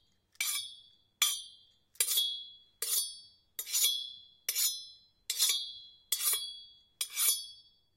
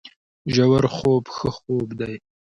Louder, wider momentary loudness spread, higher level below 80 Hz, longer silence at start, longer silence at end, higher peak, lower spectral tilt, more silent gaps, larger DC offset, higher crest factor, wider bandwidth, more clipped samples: second, -31 LUFS vs -22 LUFS; first, 19 LU vs 14 LU; second, -80 dBFS vs -50 dBFS; first, 0.4 s vs 0.05 s; about the same, 0.35 s vs 0.35 s; second, -12 dBFS vs -6 dBFS; second, 5 dB/octave vs -7 dB/octave; second, none vs 0.16-0.45 s; neither; first, 24 dB vs 16 dB; first, 16 kHz vs 10 kHz; neither